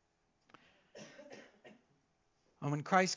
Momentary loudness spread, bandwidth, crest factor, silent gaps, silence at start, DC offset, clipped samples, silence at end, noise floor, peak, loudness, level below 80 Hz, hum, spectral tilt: 26 LU; 7.6 kHz; 26 dB; none; 0.95 s; under 0.1%; under 0.1%; 0 s; -77 dBFS; -14 dBFS; -36 LUFS; -86 dBFS; none; -4.5 dB/octave